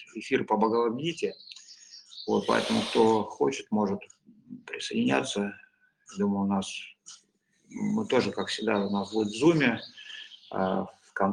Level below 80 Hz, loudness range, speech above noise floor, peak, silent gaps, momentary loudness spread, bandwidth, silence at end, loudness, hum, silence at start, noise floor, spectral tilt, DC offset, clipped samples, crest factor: -68 dBFS; 4 LU; 40 dB; -8 dBFS; none; 21 LU; 11 kHz; 0 s; -28 LUFS; none; 0 s; -68 dBFS; -5 dB/octave; under 0.1%; under 0.1%; 20 dB